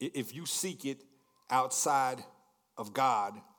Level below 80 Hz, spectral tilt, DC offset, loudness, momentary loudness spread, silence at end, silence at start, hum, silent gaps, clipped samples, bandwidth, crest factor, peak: under -90 dBFS; -2.5 dB/octave; under 0.1%; -32 LUFS; 16 LU; 0.15 s; 0 s; none; none; under 0.1%; 19.5 kHz; 18 dB; -16 dBFS